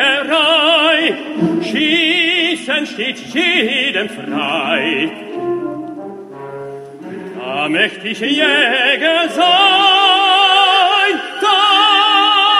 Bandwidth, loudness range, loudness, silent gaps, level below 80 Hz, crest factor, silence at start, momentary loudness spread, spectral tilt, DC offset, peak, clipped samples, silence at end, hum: 14.5 kHz; 10 LU; -12 LUFS; none; -66 dBFS; 14 dB; 0 s; 19 LU; -3 dB/octave; under 0.1%; 0 dBFS; under 0.1%; 0 s; none